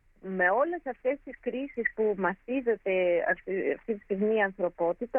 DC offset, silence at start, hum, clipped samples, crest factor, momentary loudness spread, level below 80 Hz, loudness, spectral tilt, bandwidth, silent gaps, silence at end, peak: under 0.1%; 0.25 s; none; under 0.1%; 16 dB; 8 LU; -62 dBFS; -29 LUFS; -9 dB/octave; 3.5 kHz; none; 0 s; -12 dBFS